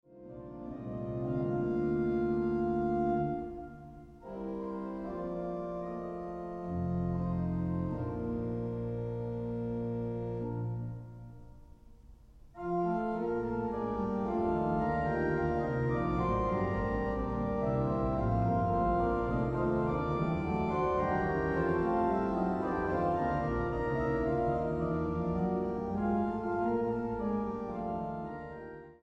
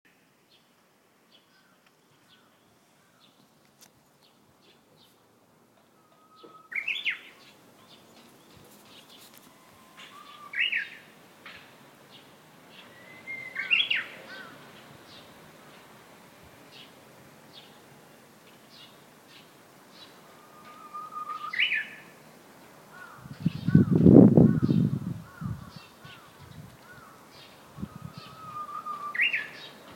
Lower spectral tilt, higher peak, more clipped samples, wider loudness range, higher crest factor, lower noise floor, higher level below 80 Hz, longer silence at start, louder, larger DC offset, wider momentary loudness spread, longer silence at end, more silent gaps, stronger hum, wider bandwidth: first, -10 dB/octave vs -7 dB/octave; second, -18 dBFS vs 0 dBFS; neither; second, 7 LU vs 24 LU; second, 14 dB vs 30 dB; second, -55 dBFS vs -64 dBFS; first, -46 dBFS vs -58 dBFS; second, 0.1 s vs 6.7 s; second, -33 LUFS vs -25 LUFS; neither; second, 10 LU vs 27 LU; about the same, 0.1 s vs 0 s; neither; neither; second, 7.2 kHz vs 17 kHz